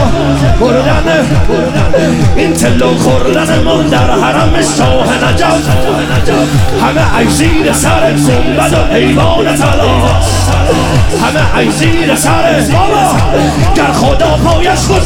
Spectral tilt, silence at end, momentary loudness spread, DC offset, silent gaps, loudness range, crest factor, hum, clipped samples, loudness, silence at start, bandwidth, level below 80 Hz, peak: -5 dB/octave; 0 s; 2 LU; under 0.1%; none; 1 LU; 8 dB; none; under 0.1%; -9 LUFS; 0 s; 17.5 kHz; -18 dBFS; 0 dBFS